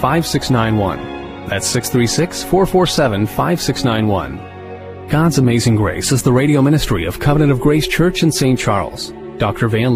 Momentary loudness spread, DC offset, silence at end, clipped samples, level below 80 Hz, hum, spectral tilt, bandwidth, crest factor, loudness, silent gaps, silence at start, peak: 13 LU; under 0.1%; 0 s; under 0.1%; -34 dBFS; none; -5.5 dB/octave; 15.5 kHz; 14 dB; -15 LUFS; none; 0 s; 0 dBFS